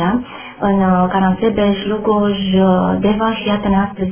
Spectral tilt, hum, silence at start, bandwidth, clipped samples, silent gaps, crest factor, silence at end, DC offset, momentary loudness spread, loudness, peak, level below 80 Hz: -11 dB/octave; none; 0 s; 3.5 kHz; under 0.1%; none; 14 dB; 0 s; under 0.1%; 5 LU; -15 LUFS; -2 dBFS; -38 dBFS